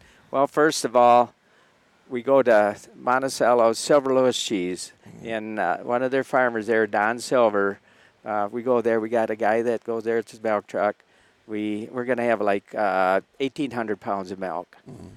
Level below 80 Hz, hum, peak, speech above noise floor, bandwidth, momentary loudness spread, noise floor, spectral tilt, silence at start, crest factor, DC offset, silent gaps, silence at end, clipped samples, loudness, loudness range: -72 dBFS; none; -6 dBFS; 37 dB; 15 kHz; 12 LU; -59 dBFS; -4 dB/octave; 0.3 s; 16 dB; under 0.1%; none; 0 s; under 0.1%; -23 LUFS; 4 LU